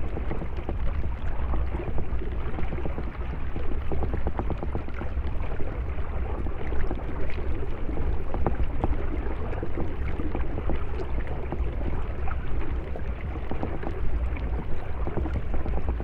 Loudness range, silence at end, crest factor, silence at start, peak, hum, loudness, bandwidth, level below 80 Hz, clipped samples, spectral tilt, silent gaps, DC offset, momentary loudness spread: 1 LU; 0 s; 16 dB; 0 s; -8 dBFS; none; -32 LUFS; 3.8 kHz; -28 dBFS; under 0.1%; -9.5 dB/octave; none; under 0.1%; 4 LU